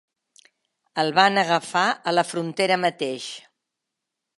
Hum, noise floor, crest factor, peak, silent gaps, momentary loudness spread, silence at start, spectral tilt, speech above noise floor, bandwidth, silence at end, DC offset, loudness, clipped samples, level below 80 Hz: none; -83 dBFS; 24 dB; 0 dBFS; none; 15 LU; 0.95 s; -3.5 dB/octave; 61 dB; 11.5 kHz; 1 s; under 0.1%; -22 LUFS; under 0.1%; -78 dBFS